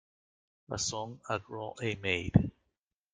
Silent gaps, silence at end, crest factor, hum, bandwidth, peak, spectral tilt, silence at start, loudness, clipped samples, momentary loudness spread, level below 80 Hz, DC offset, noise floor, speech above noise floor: none; 0.65 s; 26 dB; none; 9.6 kHz; -8 dBFS; -4.5 dB/octave; 0.7 s; -33 LUFS; under 0.1%; 12 LU; -56 dBFS; under 0.1%; -84 dBFS; 51 dB